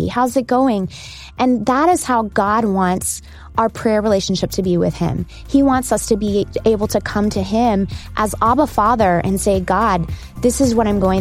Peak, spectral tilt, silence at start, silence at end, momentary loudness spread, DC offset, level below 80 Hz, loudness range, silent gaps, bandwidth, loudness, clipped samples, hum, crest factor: -2 dBFS; -5.5 dB/octave; 0 s; 0 s; 7 LU; under 0.1%; -34 dBFS; 1 LU; none; 16.5 kHz; -17 LUFS; under 0.1%; none; 14 dB